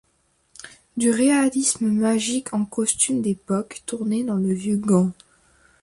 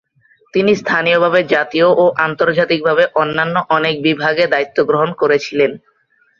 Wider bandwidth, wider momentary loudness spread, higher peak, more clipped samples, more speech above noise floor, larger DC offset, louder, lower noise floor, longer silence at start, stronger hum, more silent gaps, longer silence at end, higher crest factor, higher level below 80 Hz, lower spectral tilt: first, 11.5 kHz vs 7.2 kHz; first, 11 LU vs 4 LU; second, -6 dBFS vs 0 dBFS; neither; about the same, 44 dB vs 44 dB; neither; second, -21 LUFS vs -14 LUFS; first, -66 dBFS vs -58 dBFS; about the same, 0.65 s vs 0.55 s; neither; neither; about the same, 0.7 s vs 0.6 s; about the same, 18 dB vs 14 dB; about the same, -60 dBFS vs -58 dBFS; about the same, -4.5 dB/octave vs -5.5 dB/octave